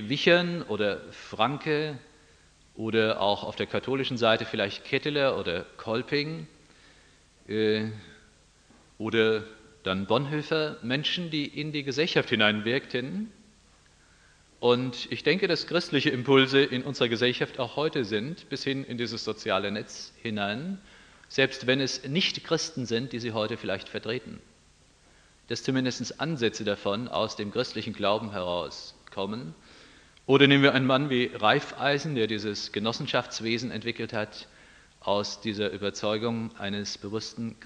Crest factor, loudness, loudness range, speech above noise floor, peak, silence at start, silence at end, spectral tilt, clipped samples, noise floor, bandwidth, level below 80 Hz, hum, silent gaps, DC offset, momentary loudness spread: 24 dB; -28 LUFS; 7 LU; 32 dB; -4 dBFS; 0 s; 0 s; -5 dB/octave; under 0.1%; -60 dBFS; 10 kHz; -64 dBFS; none; none; under 0.1%; 12 LU